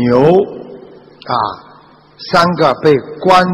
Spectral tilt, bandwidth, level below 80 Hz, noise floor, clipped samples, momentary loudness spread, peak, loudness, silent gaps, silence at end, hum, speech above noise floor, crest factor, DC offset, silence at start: -6.5 dB/octave; 14 kHz; -48 dBFS; -43 dBFS; under 0.1%; 22 LU; 0 dBFS; -12 LUFS; none; 0 s; none; 31 dB; 12 dB; under 0.1%; 0 s